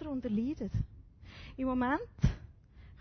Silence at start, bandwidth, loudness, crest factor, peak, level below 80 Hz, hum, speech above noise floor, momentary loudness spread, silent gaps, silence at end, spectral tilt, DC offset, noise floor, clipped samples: 0 s; 6.4 kHz; -35 LUFS; 20 dB; -14 dBFS; -44 dBFS; none; 23 dB; 18 LU; none; 0 s; -7 dB/octave; under 0.1%; -55 dBFS; under 0.1%